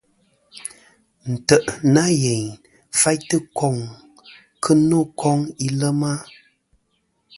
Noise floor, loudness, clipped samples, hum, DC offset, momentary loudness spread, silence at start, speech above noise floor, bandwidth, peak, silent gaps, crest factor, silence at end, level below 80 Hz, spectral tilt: -68 dBFS; -19 LUFS; under 0.1%; none; under 0.1%; 18 LU; 0.55 s; 50 dB; 11.5 kHz; 0 dBFS; none; 20 dB; 1.15 s; -56 dBFS; -5 dB/octave